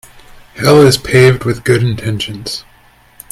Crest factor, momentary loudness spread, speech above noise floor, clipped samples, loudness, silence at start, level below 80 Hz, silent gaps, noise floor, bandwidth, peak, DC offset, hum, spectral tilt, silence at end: 12 dB; 14 LU; 35 dB; 0.2%; -11 LUFS; 0.55 s; -40 dBFS; none; -46 dBFS; 16 kHz; 0 dBFS; under 0.1%; none; -5.5 dB/octave; 0.7 s